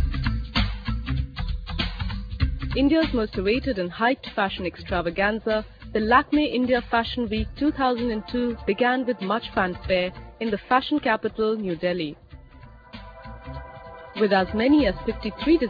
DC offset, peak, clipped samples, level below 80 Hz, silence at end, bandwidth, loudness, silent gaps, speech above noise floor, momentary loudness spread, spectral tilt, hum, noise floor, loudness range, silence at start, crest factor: under 0.1%; -6 dBFS; under 0.1%; -36 dBFS; 0 s; 5 kHz; -24 LUFS; none; 23 dB; 12 LU; -8 dB/octave; none; -46 dBFS; 3 LU; 0 s; 18 dB